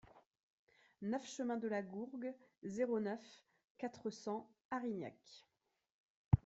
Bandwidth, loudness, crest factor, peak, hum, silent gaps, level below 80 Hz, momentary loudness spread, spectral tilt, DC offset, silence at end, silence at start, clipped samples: 8.2 kHz; -44 LUFS; 28 dB; -16 dBFS; none; 0.27-0.31 s, 0.43-0.67 s, 3.64-3.75 s, 4.65-4.71 s, 5.90-6.31 s; -62 dBFS; 13 LU; -7 dB/octave; under 0.1%; 0.05 s; 0.15 s; under 0.1%